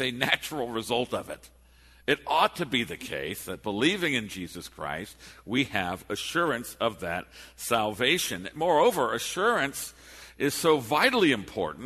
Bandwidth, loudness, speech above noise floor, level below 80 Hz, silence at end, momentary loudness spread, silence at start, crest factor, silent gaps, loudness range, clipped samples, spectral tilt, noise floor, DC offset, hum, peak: 13.5 kHz; -27 LUFS; 28 dB; -58 dBFS; 0 s; 14 LU; 0 s; 22 dB; none; 5 LU; under 0.1%; -3.5 dB/octave; -56 dBFS; under 0.1%; none; -6 dBFS